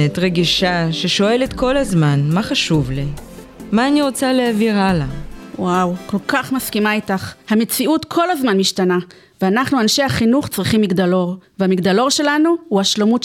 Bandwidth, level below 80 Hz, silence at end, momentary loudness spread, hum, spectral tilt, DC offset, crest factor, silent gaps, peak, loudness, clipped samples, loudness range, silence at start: 18 kHz; -40 dBFS; 0 s; 7 LU; none; -5 dB/octave; under 0.1%; 14 dB; none; -4 dBFS; -16 LUFS; under 0.1%; 2 LU; 0 s